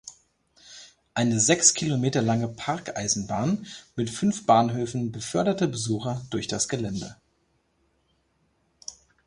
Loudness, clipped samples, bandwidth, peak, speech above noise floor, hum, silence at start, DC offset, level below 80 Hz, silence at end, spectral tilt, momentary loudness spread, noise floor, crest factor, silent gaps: -25 LUFS; under 0.1%; 11.5 kHz; -4 dBFS; 44 dB; none; 0.05 s; under 0.1%; -58 dBFS; 0.35 s; -4 dB/octave; 22 LU; -70 dBFS; 24 dB; none